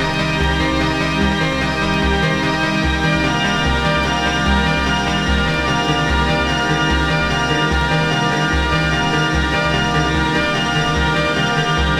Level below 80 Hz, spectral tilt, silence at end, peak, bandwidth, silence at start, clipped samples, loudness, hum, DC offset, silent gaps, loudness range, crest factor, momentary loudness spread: -26 dBFS; -5 dB/octave; 0 s; -2 dBFS; 13.5 kHz; 0 s; under 0.1%; -16 LUFS; none; under 0.1%; none; 0 LU; 14 dB; 1 LU